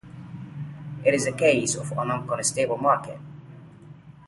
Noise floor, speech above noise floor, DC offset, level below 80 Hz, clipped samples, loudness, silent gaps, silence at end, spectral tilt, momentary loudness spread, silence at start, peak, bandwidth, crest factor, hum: -46 dBFS; 23 dB; under 0.1%; -60 dBFS; under 0.1%; -24 LUFS; none; 0 s; -4 dB/octave; 20 LU; 0.05 s; -6 dBFS; 11.5 kHz; 20 dB; none